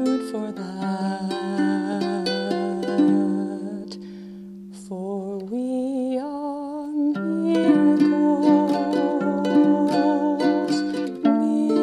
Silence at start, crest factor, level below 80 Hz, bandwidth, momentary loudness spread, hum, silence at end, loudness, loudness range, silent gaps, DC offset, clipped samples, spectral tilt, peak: 0 s; 16 dB; -68 dBFS; 11 kHz; 14 LU; none; 0 s; -22 LUFS; 9 LU; none; under 0.1%; under 0.1%; -7 dB/octave; -6 dBFS